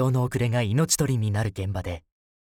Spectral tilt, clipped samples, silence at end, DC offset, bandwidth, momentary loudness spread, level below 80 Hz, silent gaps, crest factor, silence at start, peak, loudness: -5 dB/octave; under 0.1%; 0.55 s; under 0.1%; 17.5 kHz; 10 LU; -50 dBFS; none; 16 dB; 0 s; -8 dBFS; -25 LUFS